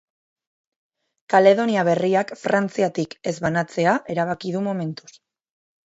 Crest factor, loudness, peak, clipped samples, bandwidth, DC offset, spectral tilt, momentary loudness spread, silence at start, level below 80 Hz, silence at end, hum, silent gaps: 20 dB; -21 LUFS; -2 dBFS; under 0.1%; 8 kHz; under 0.1%; -6 dB/octave; 11 LU; 1.3 s; -64 dBFS; 0.9 s; none; none